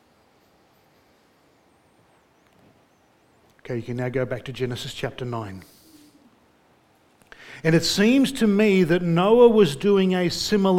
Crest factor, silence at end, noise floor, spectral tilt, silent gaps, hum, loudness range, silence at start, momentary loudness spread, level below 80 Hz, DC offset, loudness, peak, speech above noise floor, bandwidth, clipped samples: 20 dB; 0 s; -60 dBFS; -5.5 dB/octave; none; none; 16 LU; 3.7 s; 16 LU; -54 dBFS; under 0.1%; -21 LUFS; -4 dBFS; 40 dB; 16.5 kHz; under 0.1%